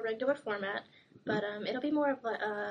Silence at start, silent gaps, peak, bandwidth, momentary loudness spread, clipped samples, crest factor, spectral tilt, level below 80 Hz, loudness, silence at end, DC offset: 0 s; none; -20 dBFS; 9.8 kHz; 6 LU; under 0.1%; 16 dB; -6.5 dB/octave; -78 dBFS; -35 LUFS; 0 s; under 0.1%